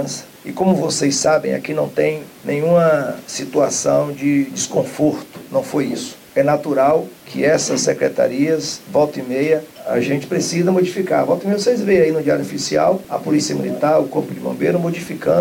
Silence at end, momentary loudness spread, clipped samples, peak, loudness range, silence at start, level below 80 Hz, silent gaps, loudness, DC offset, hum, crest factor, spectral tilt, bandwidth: 0 s; 7 LU; under 0.1%; -2 dBFS; 2 LU; 0 s; -56 dBFS; none; -18 LUFS; under 0.1%; none; 14 dB; -5 dB/octave; 17 kHz